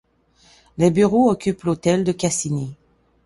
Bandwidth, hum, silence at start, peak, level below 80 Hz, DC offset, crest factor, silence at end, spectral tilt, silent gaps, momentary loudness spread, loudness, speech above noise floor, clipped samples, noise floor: 11.5 kHz; none; 0.8 s; -4 dBFS; -52 dBFS; under 0.1%; 16 dB; 0.5 s; -6 dB/octave; none; 11 LU; -19 LUFS; 38 dB; under 0.1%; -56 dBFS